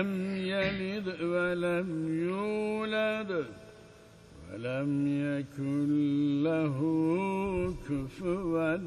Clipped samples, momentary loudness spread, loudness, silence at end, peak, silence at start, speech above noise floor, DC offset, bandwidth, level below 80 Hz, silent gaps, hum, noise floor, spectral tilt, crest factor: under 0.1%; 7 LU; -31 LUFS; 0 s; -16 dBFS; 0 s; 23 dB; under 0.1%; 11.5 kHz; -56 dBFS; none; none; -54 dBFS; -7.5 dB/octave; 14 dB